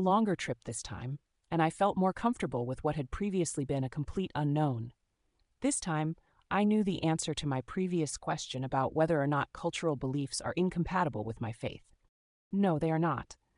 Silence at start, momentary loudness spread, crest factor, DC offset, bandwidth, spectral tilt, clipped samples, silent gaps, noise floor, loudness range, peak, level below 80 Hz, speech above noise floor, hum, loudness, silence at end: 0 s; 10 LU; 18 dB; under 0.1%; 11 kHz; -5.5 dB/octave; under 0.1%; 12.09-12.51 s; -76 dBFS; 2 LU; -16 dBFS; -56 dBFS; 44 dB; none; -33 LUFS; 0.25 s